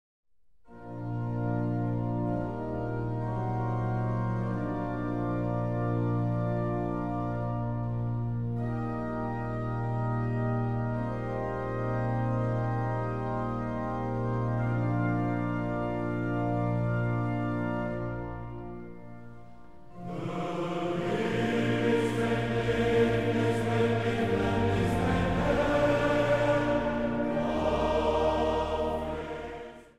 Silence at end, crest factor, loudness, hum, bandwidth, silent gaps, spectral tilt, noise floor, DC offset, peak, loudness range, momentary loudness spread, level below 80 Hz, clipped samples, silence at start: 0 s; 16 dB; -30 LUFS; none; 10 kHz; none; -8 dB/octave; -59 dBFS; 0.5%; -14 dBFS; 6 LU; 8 LU; -46 dBFS; under 0.1%; 0.25 s